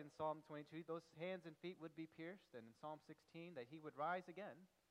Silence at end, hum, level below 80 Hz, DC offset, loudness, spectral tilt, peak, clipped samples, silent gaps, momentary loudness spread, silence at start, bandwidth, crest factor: 0.25 s; none; under -90 dBFS; under 0.1%; -53 LUFS; -6.5 dB/octave; -34 dBFS; under 0.1%; none; 12 LU; 0 s; 12 kHz; 18 dB